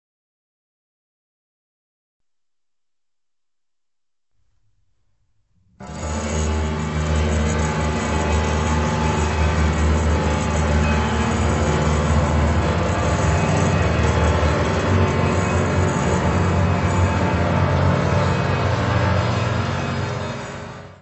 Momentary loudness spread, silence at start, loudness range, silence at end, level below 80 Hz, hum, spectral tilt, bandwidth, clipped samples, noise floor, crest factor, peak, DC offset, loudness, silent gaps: 5 LU; 5.8 s; 6 LU; 0.1 s; -28 dBFS; none; -6 dB/octave; 8.4 kHz; under 0.1%; -87 dBFS; 16 dB; -6 dBFS; under 0.1%; -20 LUFS; none